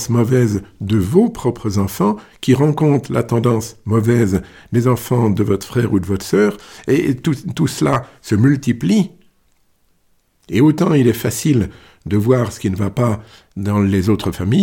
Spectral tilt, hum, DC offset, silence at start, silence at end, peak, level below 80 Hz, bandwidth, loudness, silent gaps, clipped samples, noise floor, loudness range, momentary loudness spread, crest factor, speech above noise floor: -7 dB/octave; none; under 0.1%; 0 s; 0 s; 0 dBFS; -44 dBFS; 17.5 kHz; -17 LUFS; none; under 0.1%; -59 dBFS; 2 LU; 7 LU; 16 dB; 44 dB